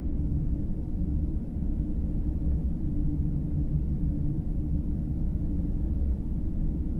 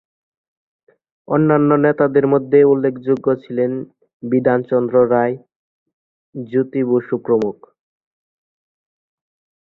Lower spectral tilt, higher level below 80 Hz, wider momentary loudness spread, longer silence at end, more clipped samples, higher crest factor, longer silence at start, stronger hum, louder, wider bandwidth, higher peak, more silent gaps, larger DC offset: first, -12 dB/octave vs -10.5 dB/octave; first, -30 dBFS vs -62 dBFS; second, 3 LU vs 12 LU; second, 0 s vs 2.1 s; neither; about the same, 12 dB vs 16 dB; second, 0 s vs 1.3 s; neither; second, -31 LUFS vs -16 LUFS; second, 2 kHz vs 4.2 kHz; second, -16 dBFS vs -2 dBFS; second, none vs 4.13-4.20 s, 5.56-5.86 s, 5.93-6.33 s; first, 0.5% vs under 0.1%